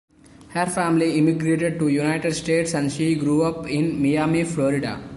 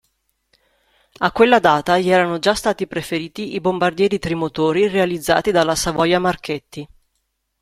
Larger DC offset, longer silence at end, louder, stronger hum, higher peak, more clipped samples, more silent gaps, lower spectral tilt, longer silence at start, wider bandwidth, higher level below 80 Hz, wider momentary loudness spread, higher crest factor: neither; second, 0 s vs 0.75 s; second, -21 LUFS vs -18 LUFS; neither; second, -8 dBFS vs 0 dBFS; neither; neither; first, -6 dB/octave vs -4.5 dB/octave; second, 0.4 s vs 1.2 s; second, 11.5 kHz vs 16 kHz; about the same, -52 dBFS vs -48 dBFS; second, 4 LU vs 11 LU; about the same, 14 dB vs 18 dB